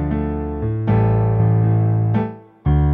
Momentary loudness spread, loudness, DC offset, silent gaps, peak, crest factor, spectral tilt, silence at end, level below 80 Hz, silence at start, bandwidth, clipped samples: 8 LU; -19 LUFS; under 0.1%; none; -6 dBFS; 10 dB; -12.5 dB/octave; 0 s; -28 dBFS; 0 s; 3.5 kHz; under 0.1%